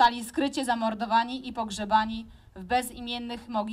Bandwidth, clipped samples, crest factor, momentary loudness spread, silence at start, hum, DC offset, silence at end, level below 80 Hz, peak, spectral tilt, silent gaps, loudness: 16 kHz; under 0.1%; 20 dB; 9 LU; 0 s; none; under 0.1%; 0 s; -54 dBFS; -8 dBFS; -3.5 dB/octave; none; -28 LUFS